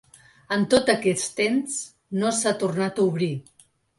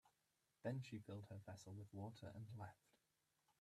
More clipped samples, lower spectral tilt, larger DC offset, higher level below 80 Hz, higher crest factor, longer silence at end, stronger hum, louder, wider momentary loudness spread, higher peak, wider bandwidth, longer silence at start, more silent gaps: neither; second, -4 dB/octave vs -7 dB/octave; neither; first, -60 dBFS vs -86 dBFS; about the same, 20 dB vs 20 dB; second, 0.6 s vs 0.85 s; neither; first, -24 LUFS vs -55 LUFS; first, 10 LU vs 7 LU; first, -6 dBFS vs -36 dBFS; second, 11.5 kHz vs 13.5 kHz; first, 0.5 s vs 0.05 s; neither